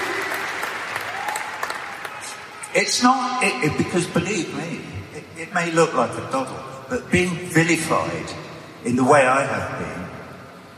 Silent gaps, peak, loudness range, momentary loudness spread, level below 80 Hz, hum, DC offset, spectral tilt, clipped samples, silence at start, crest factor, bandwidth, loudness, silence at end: none; -2 dBFS; 3 LU; 17 LU; -54 dBFS; none; under 0.1%; -4 dB/octave; under 0.1%; 0 s; 20 dB; 15.5 kHz; -22 LUFS; 0 s